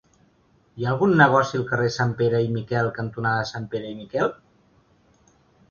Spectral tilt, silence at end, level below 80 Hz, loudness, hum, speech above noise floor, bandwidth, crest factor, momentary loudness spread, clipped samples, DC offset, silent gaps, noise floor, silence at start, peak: -6.5 dB/octave; 1.35 s; -58 dBFS; -23 LUFS; none; 39 dB; 7.2 kHz; 22 dB; 13 LU; under 0.1%; under 0.1%; none; -61 dBFS; 0.75 s; 0 dBFS